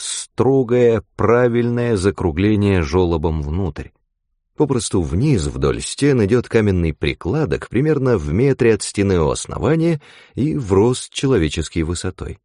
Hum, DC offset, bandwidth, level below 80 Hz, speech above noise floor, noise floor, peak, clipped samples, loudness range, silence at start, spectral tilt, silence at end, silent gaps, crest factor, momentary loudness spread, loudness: none; under 0.1%; 11 kHz; -34 dBFS; 53 dB; -70 dBFS; -2 dBFS; under 0.1%; 3 LU; 0 s; -6 dB/octave; 0.1 s; none; 16 dB; 7 LU; -18 LUFS